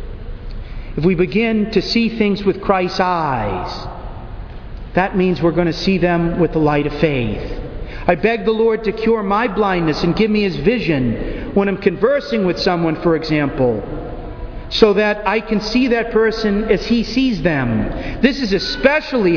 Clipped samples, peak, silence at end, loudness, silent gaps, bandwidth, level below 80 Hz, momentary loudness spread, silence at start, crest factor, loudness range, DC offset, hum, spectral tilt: under 0.1%; 0 dBFS; 0 s; -17 LUFS; none; 5.4 kHz; -32 dBFS; 14 LU; 0 s; 16 dB; 2 LU; under 0.1%; none; -7 dB/octave